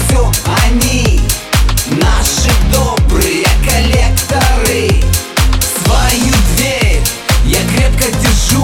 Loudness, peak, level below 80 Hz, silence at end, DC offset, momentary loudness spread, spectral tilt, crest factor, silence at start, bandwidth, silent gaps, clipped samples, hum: -11 LUFS; 0 dBFS; -12 dBFS; 0 s; under 0.1%; 2 LU; -4 dB/octave; 10 dB; 0 s; 18.5 kHz; none; under 0.1%; none